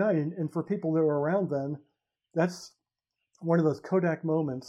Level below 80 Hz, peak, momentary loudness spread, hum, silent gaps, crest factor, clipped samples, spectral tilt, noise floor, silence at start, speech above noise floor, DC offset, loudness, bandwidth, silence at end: -80 dBFS; -12 dBFS; 12 LU; none; none; 16 dB; under 0.1%; -8 dB/octave; -86 dBFS; 0 s; 58 dB; under 0.1%; -29 LUFS; 11.5 kHz; 0 s